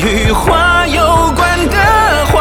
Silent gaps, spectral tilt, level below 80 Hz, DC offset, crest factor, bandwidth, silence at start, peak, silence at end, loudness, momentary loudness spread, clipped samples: none; -4.5 dB/octave; -18 dBFS; under 0.1%; 10 dB; 19.5 kHz; 0 s; 0 dBFS; 0 s; -10 LUFS; 3 LU; under 0.1%